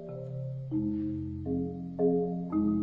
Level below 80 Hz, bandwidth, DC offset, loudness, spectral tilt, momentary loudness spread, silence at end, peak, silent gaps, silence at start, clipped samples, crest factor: -56 dBFS; 4 kHz; under 0.1%; -32 LUFS; -12.5 dB/octave; 9 LU; 0 s; -16 dBFS; none; 0 s; under 0.1%; 16 dB